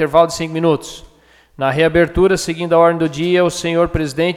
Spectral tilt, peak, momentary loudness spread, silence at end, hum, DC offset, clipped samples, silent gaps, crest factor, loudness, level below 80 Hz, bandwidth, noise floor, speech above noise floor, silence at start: -5.5 dB/octave; 0 dBFS; 6 LU; 0 s; none; under 0.1%; under 0.1%; none; 14 dB; -15 LUFS; -36 dBFS; 15 kHz; -49 dBFS; 34 dB; 0 s